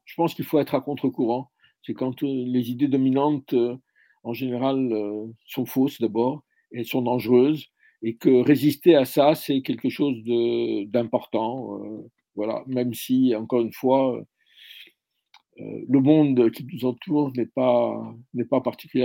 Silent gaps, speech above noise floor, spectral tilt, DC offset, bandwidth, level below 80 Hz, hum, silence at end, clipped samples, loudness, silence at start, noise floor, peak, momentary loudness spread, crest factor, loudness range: none; 38 dB; -7 dB/octave; under 0.1%; 17 kHz; -72 dBFS; none; 0 s; under 0.1%; -23 LUFS; 0.1 s; -60 dBFS; -4 dBFS; 16 LU; 20 dB; 5 LU